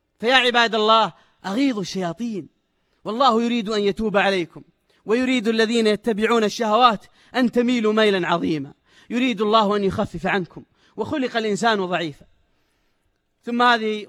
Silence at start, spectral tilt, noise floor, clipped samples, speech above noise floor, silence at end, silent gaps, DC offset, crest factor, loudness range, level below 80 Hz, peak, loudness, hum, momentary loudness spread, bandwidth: 0.2 s; -4.5 dB/octave; -69 dBFS; under 0.1%; 49 dB; 0 s; none; under 0.1%; 20 dB; 4 LU; -54 dBFS; 0 dBFS; -20 LUFS; none; 13 LU; 13 kHz